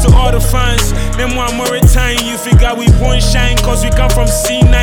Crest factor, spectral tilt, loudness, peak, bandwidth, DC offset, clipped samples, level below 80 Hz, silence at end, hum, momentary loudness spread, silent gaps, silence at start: 8 dB; -4.5 dB/octave; -12 LUFS; 0 dBFS; 18.5 kHz; under 0.1%; 0.5%; -12 dBFS; 0 s; none; 5 LU; none; 0 s